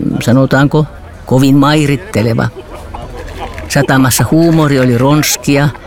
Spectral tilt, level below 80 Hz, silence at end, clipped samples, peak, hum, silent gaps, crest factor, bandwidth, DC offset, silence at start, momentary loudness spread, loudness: -5.5 dB/octave; -32 dBFS; 0 s; under 0.1%; 0 dBFS; none; none; 10 dB; 18 kHz; under 0.1%; 0 s; 18 LU; -10 LUFS